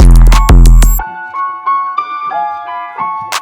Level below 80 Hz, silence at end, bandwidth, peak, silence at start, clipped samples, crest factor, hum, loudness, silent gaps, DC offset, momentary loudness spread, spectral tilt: -8 dBFS; 0 s; 16 kHz; 0 dBFS; 0 s; 5%; 8 dB; none; -12 LUFS; none; under 0.1%; 12 LU; -5 dB/octave